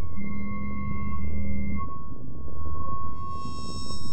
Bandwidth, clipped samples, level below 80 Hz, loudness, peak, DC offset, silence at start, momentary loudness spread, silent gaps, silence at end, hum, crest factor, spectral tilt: 8.6 kHz; under 0.1%; -40 dBFS; -35 LUFS; -12 dBFS; 10%; 0 s; 7 LU; none; 0 s; none; 10 dB; -6.5 dB/octave